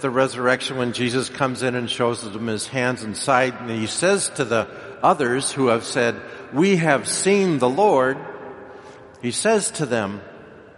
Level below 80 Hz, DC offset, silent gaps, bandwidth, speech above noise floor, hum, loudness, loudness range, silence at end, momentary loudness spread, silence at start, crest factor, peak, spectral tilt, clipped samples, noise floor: -60 dBFS; under 0.1%; none; 11.5 kHz; 21 dB; none; -21 LUFS; 3 LU; 0.15 s; 12 LU; 0 s; 20 dB; -2 dBFS; -4 dB/octave; under 0.1%; -42 dBFS